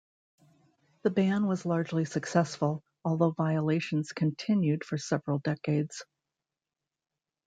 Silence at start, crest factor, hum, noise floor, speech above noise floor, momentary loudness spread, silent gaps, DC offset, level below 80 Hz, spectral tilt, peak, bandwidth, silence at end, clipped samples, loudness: 1.05 s; 20 dB; none; -90 dBFS; 61 dB; 5 LU; none; under 0.1%; -72 dBFS; -7 dB/octave; -12 dBFS; 9.2 kHz; 1.45 s; under 0.1%; -30 LUFS